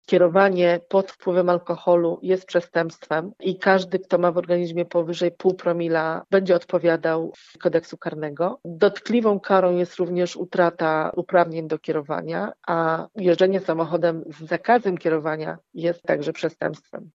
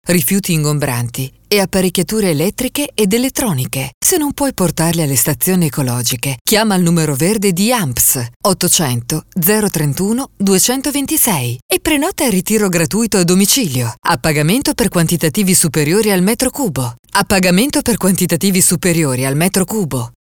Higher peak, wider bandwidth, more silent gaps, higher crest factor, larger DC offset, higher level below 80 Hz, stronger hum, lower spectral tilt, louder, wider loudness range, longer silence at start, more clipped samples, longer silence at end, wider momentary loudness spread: about the same, -2 dBFS vs 0 dBFS; second, 7.6 kHz vs over 20 kHz; second, none vs 3.94-4.01 s, 6.41-6.45 s, 8.36-8.40 s, 11.62-11.69 s, 16.99-17.03 s; about the same, 18 dB vs 14 dB; second, under 0.1% vs 0.4%; second, -74 dBFS vs -40 dBFS; neither; first, -7 dB/octave vs -4 dB/octave; second, -22 LUFS vs -14 LUFS; about the same, 2 LU vs 2 LU; about the same, 0.1 s vs 0.05 s; neither; second, 0.05 s vs 0.2 s; about the same, 8 LU vs 6 LU